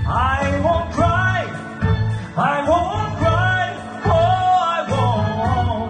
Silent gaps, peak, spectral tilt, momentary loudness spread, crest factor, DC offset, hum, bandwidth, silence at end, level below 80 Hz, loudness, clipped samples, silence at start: none; -6 dBFS; -6.5 dB/octave; 6 LU; 12 dB; under 0.1%; none; 9.2 kHz; 0 s; -32 dBFS; -19 LUFS; under 0.1%; 0 s